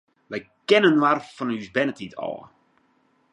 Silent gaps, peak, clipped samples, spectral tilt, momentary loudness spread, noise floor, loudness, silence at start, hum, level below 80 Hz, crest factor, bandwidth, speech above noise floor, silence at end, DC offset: none; -4 dBFS; under 0.1%; -5.5 dB/octave; 18 LU; -65 dBFS; -22 LUFS; 0.3 s; none; -70 dBFS; 20 dB; 10.5 kHz; 42 dB; 0.9 s; under 0.1%